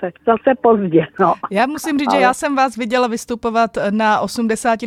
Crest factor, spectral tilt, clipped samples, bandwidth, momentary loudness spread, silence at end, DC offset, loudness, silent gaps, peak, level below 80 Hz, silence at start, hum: 16 dB; -5 dB/octave; under 0.1%; 15 kHz; 5 LU; 0 s; under 0.1%; -16 LUFS; none; 0 dBFS; -52 dBFS; 0 s; none